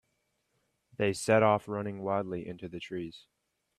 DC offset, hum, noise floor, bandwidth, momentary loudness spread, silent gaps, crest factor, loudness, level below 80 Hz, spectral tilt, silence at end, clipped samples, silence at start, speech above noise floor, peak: under 0.1%; none; -78 dBFS; 13.5 kHz; 17 LU; none; 22 dB; -31 LUFS; -68 dBFS; -5.5 dB/octave; 0.6 s; under 0.1%; 1 s; 47 dB; -12 dBFS